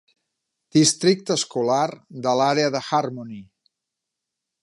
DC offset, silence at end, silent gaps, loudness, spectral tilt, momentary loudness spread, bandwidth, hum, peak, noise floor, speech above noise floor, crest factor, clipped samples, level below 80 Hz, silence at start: under 0.1%; 1.2 s; none; -21 LUFS; -4 dB/octave; 14 LU; 11.5 kHz; none; -4 dBFS; -84 dBFS; 62 dB; 18 dB; under 0.1%; -70 dBFS; 0.75 s